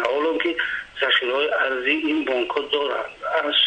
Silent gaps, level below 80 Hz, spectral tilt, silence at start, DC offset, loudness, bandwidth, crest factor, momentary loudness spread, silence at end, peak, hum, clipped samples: none; -60 dBFS; -3 dB/octave; 0 s; under 0.1%; -22 LUFS; 9.2 kHz; 16 dB; 6 LU; 0 s; -6 dBFS; none; under 0.1%